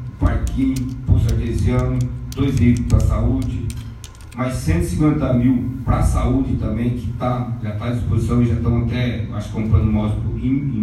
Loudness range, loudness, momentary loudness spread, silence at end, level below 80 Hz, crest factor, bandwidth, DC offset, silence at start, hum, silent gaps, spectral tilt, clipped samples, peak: 1 LU; -19 LUFS; 8 LU; 0 s; -26 dBFS; 16 dB; 13.5 kHz; under 0.1%; 0 s; none; none; -8 dB/octave; under 0.1%; -2 dBFS